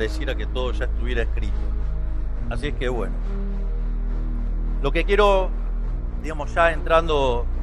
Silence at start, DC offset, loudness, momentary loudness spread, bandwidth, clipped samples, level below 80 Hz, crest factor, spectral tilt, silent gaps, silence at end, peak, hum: 0 s; under 0.1%; -24 LUFS; 11 LU; 8.6 kHz; under 0.1%; -24 dBFS; 18 dB; -6.5 dB/octave; none; 0 s; -2 dBFS; none